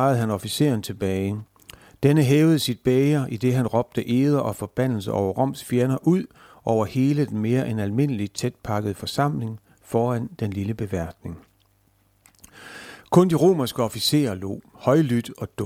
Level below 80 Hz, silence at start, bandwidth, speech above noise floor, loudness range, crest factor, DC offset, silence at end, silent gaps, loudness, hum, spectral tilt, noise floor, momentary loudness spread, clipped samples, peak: -54 dBFS; 0 s; 16.5 kHz; 41 dB; 7 LU; 18 dB; under 0.1%; 0 s; none; -23 LUFS; none; -6.5 dB/octave; -63 dBFS; 13 LU; under 0.1%; -4 dBFS